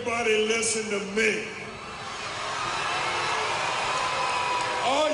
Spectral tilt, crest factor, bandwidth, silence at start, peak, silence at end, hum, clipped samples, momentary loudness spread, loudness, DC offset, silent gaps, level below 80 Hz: -2 dB/octave; 18 dB; 11 kHz; 0 s; -10 dBFS; 0 s; none; under 0.1%; 10 LU; -26 LUFS; under 0.1%; none; -58 dBFS